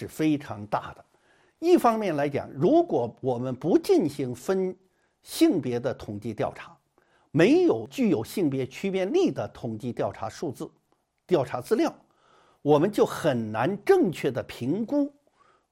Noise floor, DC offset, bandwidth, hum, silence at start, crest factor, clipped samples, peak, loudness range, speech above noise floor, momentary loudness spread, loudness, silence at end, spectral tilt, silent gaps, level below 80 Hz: -70 dBFS; under 0.1%; 16 kHz; none; 0 s; 18 dB; under 0.1%; -8 dBFS; 5 LU; 44 dB; 12 LU; -26 LUFS; 0.6 s; -6.5 dB/octave; none; -64 dBFS